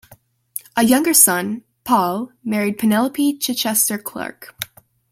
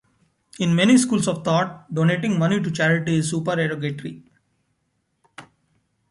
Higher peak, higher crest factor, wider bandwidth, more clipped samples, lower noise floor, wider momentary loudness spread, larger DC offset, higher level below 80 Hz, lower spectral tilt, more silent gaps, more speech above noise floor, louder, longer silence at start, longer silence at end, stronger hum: first, 0 dBFS vs -4 dBFS; about the same, 20 dB vs 18 dB; first, 17 kHz vs 11.5 kHz; neither; second, -51 dBFS vs -72 dBFS; first, 19 LU vs 11 LU; neither; about the same, -60 dBFS vs -62 dBFS; second, -2.5 dB/octave vs -5.5 dB/octave; neither; second, 33 dB vs 51 dB; first, -17 LUFS vs -21 LUFS; second, 0.1 s vs 0.6 s; second, 0.45 s vs 0.65 s; neither